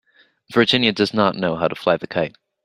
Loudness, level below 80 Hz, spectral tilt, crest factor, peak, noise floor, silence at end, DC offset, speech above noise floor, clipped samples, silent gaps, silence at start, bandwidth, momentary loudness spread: -19 LUFS; -58 dBFS; -5.5 dB/octave; 20 dB; 0 dBFS; -50 dBFS; 0.35 s; under 0.1%; 31 dB; under 0.1%; none; 0.5 s; 12.5 kHz; 9 LU